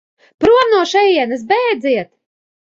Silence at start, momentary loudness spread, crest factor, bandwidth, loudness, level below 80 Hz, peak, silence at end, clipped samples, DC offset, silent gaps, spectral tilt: 0.4 s; 7 LU; 14 dB; 7.6 kHz; -14 LUFS; -50 dBFS; -2 dBFS; 0.75 s; under 0.1%; under 0.1%; none; -4 dB/octave